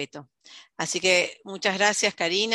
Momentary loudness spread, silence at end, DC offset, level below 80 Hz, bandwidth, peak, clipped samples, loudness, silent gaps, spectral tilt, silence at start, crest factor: 10 LU; 0 s; under 0.1%; -72 dBFS; 15.5 kHz; -4 dBFS; under 0.1%; -23 LUFS; none; -1.5 dB/octave; 0 s; 20 dB